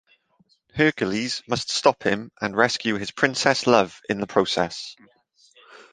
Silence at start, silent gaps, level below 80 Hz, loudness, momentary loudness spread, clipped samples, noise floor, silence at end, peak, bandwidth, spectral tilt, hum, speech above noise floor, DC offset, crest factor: 0.75 s; none; -58 dBFS; -22 LUFS; 8 LU; under 0.1%; -64 dBFS; 0.1 s; -2 dBFS; 10 kHz; -4 dB/octave; none; 41 dB; under 0.1%; 22 dB